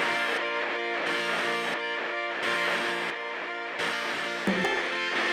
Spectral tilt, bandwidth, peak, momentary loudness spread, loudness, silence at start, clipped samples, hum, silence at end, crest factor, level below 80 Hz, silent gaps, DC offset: -3 dB/octave; 16 kHz; -14 dBFS; 4 LU; -28 LUFS; 0 s; under 0.1%; none; 0 s; 16 dB; -70 dBFS; none; under 0.1%